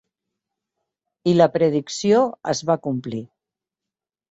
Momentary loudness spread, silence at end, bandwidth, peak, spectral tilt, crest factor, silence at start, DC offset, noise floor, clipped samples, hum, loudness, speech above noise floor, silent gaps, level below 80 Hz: 11 LU; 1.05 s; 8 kHz; -2 dBFS; -6 dB/octave; 20 dB; 1.25 s; under 0.1%; -88 dBFS; under 0.1%; none; -20 LUFS; 69 dB; none; -62 dBFS